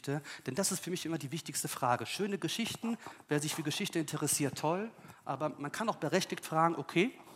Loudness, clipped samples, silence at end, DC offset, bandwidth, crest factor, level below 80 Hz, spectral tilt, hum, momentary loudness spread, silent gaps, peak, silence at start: -35 LUFS; under 0.1%; 0 s; under 0.1%; 16 kHz; 22 dB; -80 dBFS; -4 dB/octave; none; 8 LU; none; -12 dBFS; 0.05 s